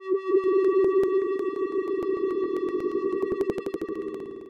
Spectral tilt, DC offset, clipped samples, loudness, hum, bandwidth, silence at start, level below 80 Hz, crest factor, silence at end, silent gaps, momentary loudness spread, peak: -7.5 dB/octave; under 0.1%; under 0.1%; -26 LUFS; none; 6 kHz; 0 s; -60 dBFS; 14 dB; 0 s; none; 10 LU; -12 dBFS